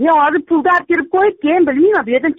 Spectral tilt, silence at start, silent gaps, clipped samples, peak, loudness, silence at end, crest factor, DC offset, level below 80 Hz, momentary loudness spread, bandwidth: -2.5 dB/octave; 0 s; none; under 0.1%; -4 dBFS; -13 LUFS; 0.05 s; 10 dB; under 0.1%; -54 dBFS; 3 LU; 5.2 kHz